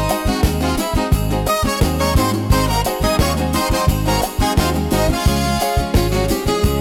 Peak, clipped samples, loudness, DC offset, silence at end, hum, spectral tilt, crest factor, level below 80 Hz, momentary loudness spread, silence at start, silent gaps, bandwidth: -4 dBFS; under 0.1%; -17 LUFS; under 0.1%; 0 s; none; -5 dB/octave; 12 dB; -22 dBFS; 2 LU; 0 s; none; 18.5 kHz